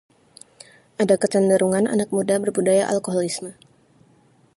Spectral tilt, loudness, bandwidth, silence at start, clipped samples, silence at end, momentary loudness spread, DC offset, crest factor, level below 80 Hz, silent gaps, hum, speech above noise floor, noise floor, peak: -5 dB/octave; -20 LUFS; 11.5 kHz; 1 s; under 0.1%; 1.05 s; 10 LU; under 0.1%; 18 dB; -66 dBFS; none; none; 37 dB; -57 dBFS; -4 dBFS